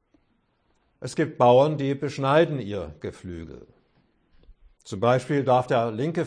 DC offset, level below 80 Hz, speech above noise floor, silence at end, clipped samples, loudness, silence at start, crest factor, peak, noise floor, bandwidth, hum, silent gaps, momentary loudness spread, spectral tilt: under 0.1%; -56 dBFS; 45 dB; 0 s; under 0.1%; -23 LUFS; 1 s; 18 dB; -6 dBFS; -69 dBFS; 10.5 kHz; none; none; 20 LU; -7 dB/octave